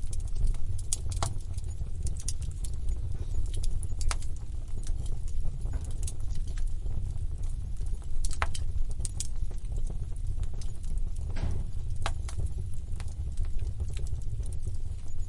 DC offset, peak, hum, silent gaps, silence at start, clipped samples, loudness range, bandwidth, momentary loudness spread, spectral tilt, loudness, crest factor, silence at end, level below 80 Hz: under 0.1%; -8 dBFS; none; none; 0 s; under 0.1%; 2 LU; 11.5 kHz; 5 LU; -4.5 dB/octave; -37 LUFS; 20 dB; 0 s; -32 dBFS